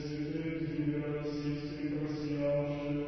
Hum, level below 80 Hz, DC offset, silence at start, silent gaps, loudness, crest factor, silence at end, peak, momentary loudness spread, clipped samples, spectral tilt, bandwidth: none; -56 dBFS; under 0.1%; 0 s; none; -36 LUFS; 12 dB; 0 s; -22 dBFS; 5 LU; under 0.1%; -7.5 dB/octave; 6.2 kHz